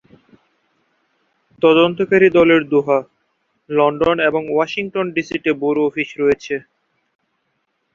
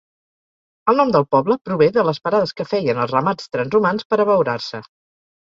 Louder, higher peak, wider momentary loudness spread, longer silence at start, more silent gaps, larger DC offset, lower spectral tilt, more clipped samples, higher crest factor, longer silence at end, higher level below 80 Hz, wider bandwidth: about the same, -16 LUFS vs -18 LUFS; about the same, -2 dBFS vs -2 dBFS; about the same, 8 LU vs 7 LU; first, 1.6 s vs 0.85 s; second, none vs 1.61-1.65 s, 4.05-4.10 s; neither; about the same, -6.5 dB/octave vs -7 dB/octave; neither; about the same, 16 dB vs 18 dB; first, 1.35 s vs 0.6 s; first, -54 dBFS vs -60 dBFS; about the same, 7.2 kHz vs 7.6 kHz